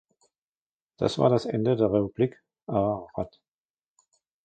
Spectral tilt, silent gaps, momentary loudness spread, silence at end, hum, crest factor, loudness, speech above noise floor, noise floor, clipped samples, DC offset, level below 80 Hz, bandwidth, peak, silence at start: -7.5 dB/octave; 2.63-2.67 s; 13 LU; 1.15 s; none; 22 dB; -26 LUFS; over 65 dB; under -90 dBFS; under 0.1%; under 0.1%; -56 dBFS; 9.2 kHz; -6 dBFS; 1 s